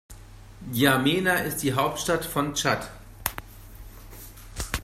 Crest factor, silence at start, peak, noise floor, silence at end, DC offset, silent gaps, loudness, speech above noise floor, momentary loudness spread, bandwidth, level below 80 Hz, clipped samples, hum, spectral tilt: 26 dB; 0.1 s; -2 dBFS; -45 dBFS; 0 s; under 0.1%; none; -25 LUFS; 20 dB; 22 LU; 16 kHz; -44 dBFS; under 0.1%; none; -4 dB/octave